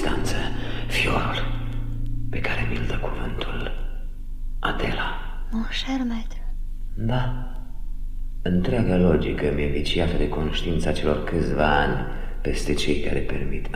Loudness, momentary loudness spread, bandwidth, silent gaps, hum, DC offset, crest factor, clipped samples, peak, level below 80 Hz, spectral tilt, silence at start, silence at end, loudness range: -26 LUFS; 16 LU; 12 kHz; none; 50 Hz at -45 dBFS; under 0.1%; 18 dB; under 0.1%; -6 dBFS; -28 dBFS; -6 dB/octave; 0 s; 0 s; 6 LU